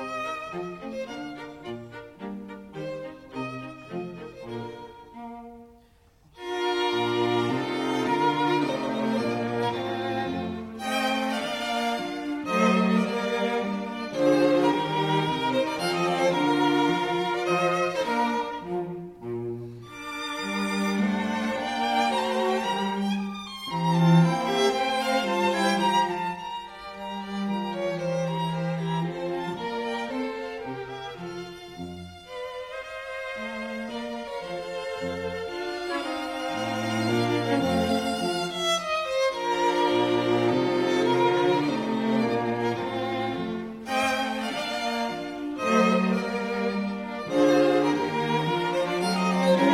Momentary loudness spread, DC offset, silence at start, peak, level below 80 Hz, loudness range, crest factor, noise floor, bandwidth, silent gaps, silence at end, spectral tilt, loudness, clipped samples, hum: 14 LU; under 0.1%; 0 s; -8 dBFS; -60 dBFS; 12 LU; 18 dB; -58 dBFS; 15.5 kHz; none; 0 s; -5.5 dB/octave; -26 LUFS; under 0.1%; none